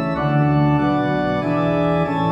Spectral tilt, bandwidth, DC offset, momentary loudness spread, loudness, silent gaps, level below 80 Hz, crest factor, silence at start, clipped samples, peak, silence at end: -9 dB/octave; 6.2 kHz; under 0.1%; 3 LU; -18 LUFS; none; -42 dBFS; 12 dB; 0 s; under 0.1%; -6 dBFS; 0 s